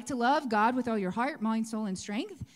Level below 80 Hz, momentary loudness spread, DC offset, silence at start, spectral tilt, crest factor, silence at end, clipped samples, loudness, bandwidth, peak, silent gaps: -64 dBFS; 8 LU; under 0.1%; 0 s; -5 dB/octave; 14 dB; 0.1 s; under 0.1%; -30 LUFS; 12.5 kHz; -16 dBFS; none